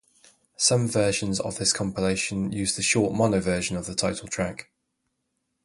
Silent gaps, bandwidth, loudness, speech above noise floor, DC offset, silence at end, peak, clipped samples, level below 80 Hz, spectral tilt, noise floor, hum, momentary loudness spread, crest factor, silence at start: none; 11.5 kHz; -25 LUFS; 52 dB; under 0.1%; 1 s; -8 dBFS; under 0.1%; -50 dBFS; -3.5 dB/octave; -77 dBFS; none; 7 LU; 20 dB; 0.6 s